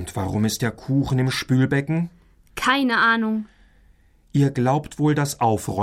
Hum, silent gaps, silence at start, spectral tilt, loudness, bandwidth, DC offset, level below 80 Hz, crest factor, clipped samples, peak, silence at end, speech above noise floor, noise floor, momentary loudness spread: none; none; 0 s; -5.5 dB/octave; -21 LUFS; 16 kHz; under 0.1%; -48 dBFS; 16 dB; under 0.1%; -6 dBFS; 0 s; 34 dB; -55 dBFS; 8 LU